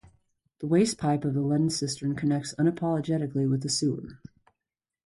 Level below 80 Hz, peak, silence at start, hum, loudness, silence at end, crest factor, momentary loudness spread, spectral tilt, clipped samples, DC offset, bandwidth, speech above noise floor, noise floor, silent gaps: -62 dBFS; -12 dBFS; 0.6 s; none; -27 LUFS; 0.9 s; 16 dB; 6 LU; -5.5 dB/octave; under 0.1%; under 0.1%; 11.5 kHz; 63 dB; -89 dBFS; none